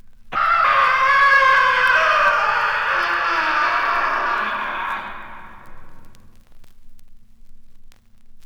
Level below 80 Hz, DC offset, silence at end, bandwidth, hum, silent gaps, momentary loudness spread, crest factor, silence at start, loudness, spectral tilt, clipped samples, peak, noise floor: -44 dBFS; under 0.1%; 0 s; 18.5 kHz; none; none; 13 LU; 14 dB; 0.05 s; -16 LUFS; -2 dB/octave; under 0.1%; -4 dBFS; -40 dBFS